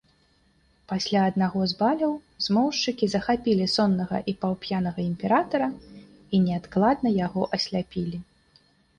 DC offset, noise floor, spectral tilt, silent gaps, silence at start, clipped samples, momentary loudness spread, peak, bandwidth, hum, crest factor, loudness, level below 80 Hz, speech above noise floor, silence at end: under 0.1%; -63 dBFS; -6 dB/octave; none; 0.9 s; under 0.1%; 7 LU; -8 dBFS; 9.6 kHz; none; 16 dB; -25 LUFS; -56 dBFS; 39 dB; 0.75 s